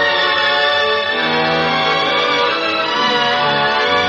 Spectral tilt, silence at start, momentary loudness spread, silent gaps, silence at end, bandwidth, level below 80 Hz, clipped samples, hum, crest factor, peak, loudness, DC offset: -3.5 dB/octave; 0 s; 2 LU; none; 0 s; 10 kHz; -52 dBFS; under 0.1%; none; 12 dB; -4 dBFS; -14 LUFS; under 0.1%